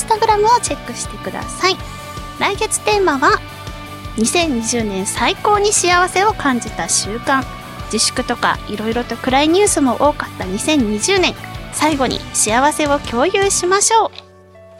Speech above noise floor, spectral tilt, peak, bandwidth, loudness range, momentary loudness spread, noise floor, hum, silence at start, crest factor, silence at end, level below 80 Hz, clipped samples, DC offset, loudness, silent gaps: 26 dB; -2.5 dB/octave; -2 dBFS; 16.5 kHz; 2 LU; 12 LU; -42 dBFS; none; 0 s; 16 dB; 0 s; -36 dBFS; under 0.1%; under 0.1%; -16 LUFS; none